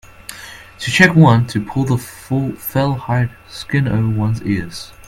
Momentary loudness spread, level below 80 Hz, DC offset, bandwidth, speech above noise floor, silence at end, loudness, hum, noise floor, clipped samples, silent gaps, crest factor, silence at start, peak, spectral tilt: 21 LU; -44 dBFS; under 0.1%; 16 kHz; 20 dB; 0.05 s; -16 LUFS; none; -36 dBFS; under 0.1%; none; 16 dB; 0.3 s; 0 dBFS; -6 dB/octave